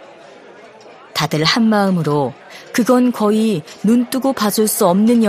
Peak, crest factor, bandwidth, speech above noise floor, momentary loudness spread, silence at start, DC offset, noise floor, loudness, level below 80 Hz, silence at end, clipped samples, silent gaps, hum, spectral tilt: 0 dBFS; 16 dB; 15.5 kHz; 26 dB; 8 LU; 0 s; under 0.1%; -40 dBFS; -16 LUFS; -58 dBFS; 0 s; under 0.1%; none; none; -5 dB/octave